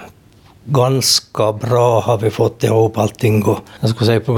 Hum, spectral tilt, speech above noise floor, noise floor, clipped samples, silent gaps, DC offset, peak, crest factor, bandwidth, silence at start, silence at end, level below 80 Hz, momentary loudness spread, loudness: none; -5 dB/octave; 32 dB; -46 dBFS; under 0.1%; none; under 0.1%; -2 dBFS; 14 dB; 18.5 kHz; 0 s; 0 s; -50 dBFS; 6 LU; -15 LUFS